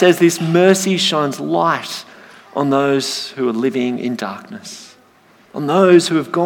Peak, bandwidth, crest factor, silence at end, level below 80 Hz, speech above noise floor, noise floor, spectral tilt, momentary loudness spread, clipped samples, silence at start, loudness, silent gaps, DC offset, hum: 0 dBFS; 18 kHz; 16 dB; 0 s; -70 dBFS; 35 dB; -50 dBFS; -4.5 dB/octave; 19 LU; under 0.1%; 0 s; -16 LUFS; none; under 0.1%; none